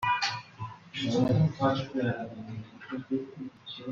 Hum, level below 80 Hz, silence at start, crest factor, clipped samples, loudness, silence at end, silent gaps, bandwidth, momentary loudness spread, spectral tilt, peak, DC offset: none; -62 dBFS; 0 s; 18 dB; under 0.1%; -30 LUFS; 0 s; none; 7.6 kHz; 17 LU; -6 dB/octave; -14 dBFS; under 0.1%